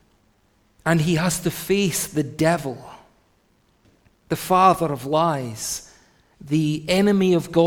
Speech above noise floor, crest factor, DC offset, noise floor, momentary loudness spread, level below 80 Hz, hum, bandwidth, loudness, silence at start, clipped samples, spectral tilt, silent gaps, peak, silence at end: 42 dB; 20 dB; under 0.1%; -62 dBFS; 11 LU; -52 dBFS; none; 18.5 kHz; -21 LUFS; 0.85 s; under 0.1%; -5 dB/octave; none; -2 dBFS; 0 s